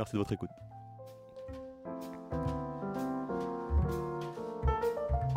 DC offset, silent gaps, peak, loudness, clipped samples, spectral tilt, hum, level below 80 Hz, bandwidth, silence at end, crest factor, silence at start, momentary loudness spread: under 0.1%; none; -18 dBFS; -37 LUFS; under 0.1%; -8 dB/octave; none; -42 dBFS; 16 kHz; 0 s; 18 dB; 0 s; 17 LU